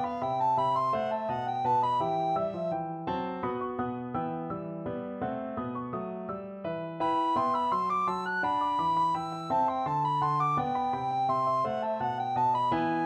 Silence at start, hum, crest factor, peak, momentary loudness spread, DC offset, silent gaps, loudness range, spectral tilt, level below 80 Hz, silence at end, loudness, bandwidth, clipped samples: 0 s; none; 12 dB; -16 dBFS; 9 LU; under 0.1%; none; 6 LU; -7 dB/octave; -64 dBFS; 0 s; -30 LUFS; 10 kHz; under 0.1%